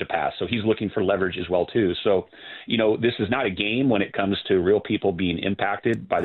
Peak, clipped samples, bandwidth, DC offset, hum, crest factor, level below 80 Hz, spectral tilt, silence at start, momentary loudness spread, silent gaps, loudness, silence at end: -6 dBFS; under 0.1%; 4.4 kHz; under 0.1%; none; 16 dB; -56 dBFS; -8 dB/octave; 0 s; 4 LU; none; -23 LUFS; 0 s